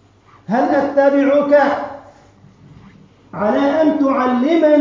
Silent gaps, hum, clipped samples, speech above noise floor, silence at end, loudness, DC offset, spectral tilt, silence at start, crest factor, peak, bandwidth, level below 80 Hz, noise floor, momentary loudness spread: none; none; under 0.1%; 33 dB; 0 s; -15 LUFS; under 0.1%; -7 dB/octave; 0.5 s; 14 dB; -2 dBFS; 7.2 kHz; -56 dBFS; -46 dBFS; 9 LU